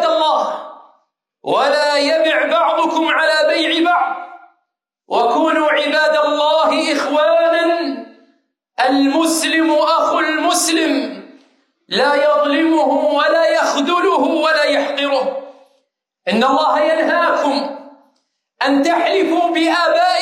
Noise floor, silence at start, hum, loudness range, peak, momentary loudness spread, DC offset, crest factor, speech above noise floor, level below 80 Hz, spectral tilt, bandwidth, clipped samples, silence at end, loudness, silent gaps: -73 dBFS; 0 s; none; 2 LU; -2 dBFS; 8 LU; under 0.1%; 14 dB; 59 dB; -70 dBFS; -2 dB/octave; 15.5 kHz; under 0.1%; 0 s; -15 LUFS; none